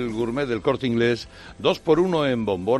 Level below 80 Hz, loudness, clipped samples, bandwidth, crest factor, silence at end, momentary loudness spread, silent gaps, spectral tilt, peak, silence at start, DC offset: -50 dBFS; -23 LUFS; under 0.1%; 12 kHz; 18 dB; 0 s; 6 LU; none; -6.5 dB/octave; -6 dBFS; 0 s; under 0.1%